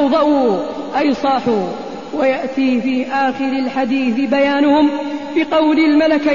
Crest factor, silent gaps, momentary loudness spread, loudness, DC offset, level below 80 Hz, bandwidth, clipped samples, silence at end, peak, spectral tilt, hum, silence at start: 12 dB; none; 8 LU; -16 LUFS; 0.7%; -52 dBFS; 7.2 kHz; under 0.1%; 0 s; -4 dBFS; -6 dB/octave; none; 0 s